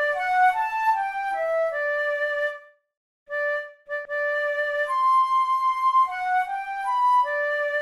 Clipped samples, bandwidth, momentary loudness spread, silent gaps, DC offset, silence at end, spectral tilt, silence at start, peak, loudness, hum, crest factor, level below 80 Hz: under 0.1%; 13.5 kHz; 8 LU; 2.97-3.26 s; under 0.1%; 0 s; -0.5 dB/octave; 0 s; -10 dBFS; -23 LUFS; none; 14 dB; -66 dBFS